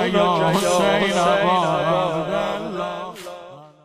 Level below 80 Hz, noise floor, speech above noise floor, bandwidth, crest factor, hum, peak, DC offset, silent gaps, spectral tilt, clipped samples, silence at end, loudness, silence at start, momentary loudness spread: -52 dBFS; -40 dBFS; 23 dB; 15.5 kHz; 16 dB; none; -6 dBFS; under 0.1%; none; -4.5 dB/octave; under 0.1%; 0.2 s; -19 LUFS; 0 s; 15 LU